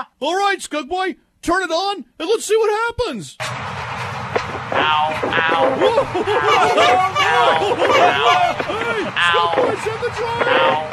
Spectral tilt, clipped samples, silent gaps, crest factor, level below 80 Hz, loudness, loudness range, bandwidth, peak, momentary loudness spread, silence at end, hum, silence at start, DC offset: -3.5 dB/octave; under 0.1%; none; 16 dB; -48 dBFS; -17 LUFS; 6 LU; 14 kHz; -2 dBFS; 11 LU; 0 s; none; 0 s; under 0.1%